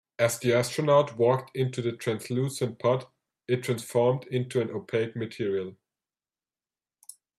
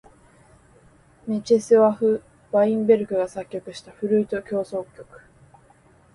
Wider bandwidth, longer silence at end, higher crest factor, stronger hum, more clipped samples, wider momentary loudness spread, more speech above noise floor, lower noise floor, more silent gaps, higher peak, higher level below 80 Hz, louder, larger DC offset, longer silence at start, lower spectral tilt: first, 15 kHz vs 11.5 kHz; first, 1.65 s vs 1.1 s; about the same, 20 dB vs 18 dB; neither; neither; second, 9 LU vs 16 LU; first, over 63 dB vs 34 dB; first, under -90 dBFS vs -55 dBFS; neither; about the same, -8 dBFS vs -6 dBFS; second, -68 dBFS vs -62 dBFS; second, -27 LUFS vs -22 LUFS; neither; second, 0.2 s vs 1.25 s; about the same, -5.5 dB/octave vs -6.5 dB/octave